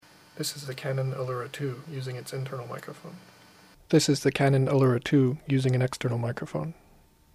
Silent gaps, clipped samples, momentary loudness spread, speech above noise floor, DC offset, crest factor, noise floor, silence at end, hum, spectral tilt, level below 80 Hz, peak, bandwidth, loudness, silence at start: none; under 0.1%; 14 LU; 31 dB; under 0.1%; 18 dB; -58 dBFS; 0.6 s; none; -6 dB/octave; -62 dBFS; -8 dBFS; 15.5 kHz; -27 LUFS; 0.35 s